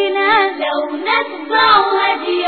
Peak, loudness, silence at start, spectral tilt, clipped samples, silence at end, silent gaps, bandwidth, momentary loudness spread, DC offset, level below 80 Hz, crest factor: -2 dBFS; -14 LUFS; 0 s; 1.5 dB/octave; under 0.1%; 0 s; none; 4.6 kHz; 8 LU; under 0.1%; -56 dBFS; 14 dB